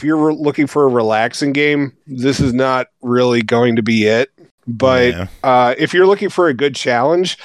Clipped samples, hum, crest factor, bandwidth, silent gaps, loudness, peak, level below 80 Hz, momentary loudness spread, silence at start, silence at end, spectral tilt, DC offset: under 0.1%; none; 12 dB; 12.5 kHz; 4.51-4.58 s; -14 LUFS; -2 dBFS; -48 dBFS; 7 LU; 0 s; 0 s; -5.5 dB/octave; under 0.1%